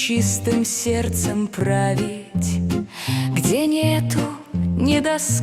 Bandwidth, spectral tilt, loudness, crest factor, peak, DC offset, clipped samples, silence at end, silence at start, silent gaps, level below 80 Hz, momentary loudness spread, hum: 16 kHz; -5 dB/octave; -21 LUFS; 14 dB; -6 dBFS; under 0.1%; under 0.1%; 0 s; 0 s; none; -46 dBFS; 6 LU; none